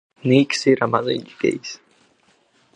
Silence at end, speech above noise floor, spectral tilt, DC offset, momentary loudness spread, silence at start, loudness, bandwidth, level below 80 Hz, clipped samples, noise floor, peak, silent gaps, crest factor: 1 s; 41 dB; -5.5 dB/octave; under 0.1%; 15 LU; 0.25 s; -19 LUFS; 10 kHz; -64 dBFS; under 0.1%; -60 dBFS; -2 dBFS; none; 20 dB